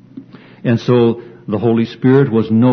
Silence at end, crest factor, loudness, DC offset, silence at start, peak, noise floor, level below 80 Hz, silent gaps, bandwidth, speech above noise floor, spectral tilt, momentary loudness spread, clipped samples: 0 s; 14 dB; -14 LUFS; under 0.1%; 0.15 s; 0 dBFS; -36 dBFS; -54 dBFS; none; 6.4 kHz; 24 dB; -9 dB/octave; 11 LU; under 0.1%